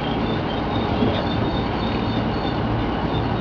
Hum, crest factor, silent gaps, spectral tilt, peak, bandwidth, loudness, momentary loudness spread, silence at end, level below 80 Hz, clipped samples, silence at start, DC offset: none; 14 dB; none; -8 dB/octave; -8 dBFS; 5.4 kHz; -23 LUFS; 2 LU; 0 s; -34 dBFS; under 0.1%; 0 s; under 0.1%